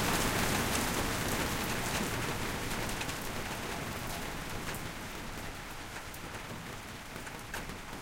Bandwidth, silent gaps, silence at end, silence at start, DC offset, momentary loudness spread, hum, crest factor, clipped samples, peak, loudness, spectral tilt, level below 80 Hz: 17 kHz; none; 0 s; 0 s; under 0.1%; 12 LU; none; 18 dB; under 0.1%; -18 dBFS; -36 LUFS; -3.5 dB/octave; -46 dBFS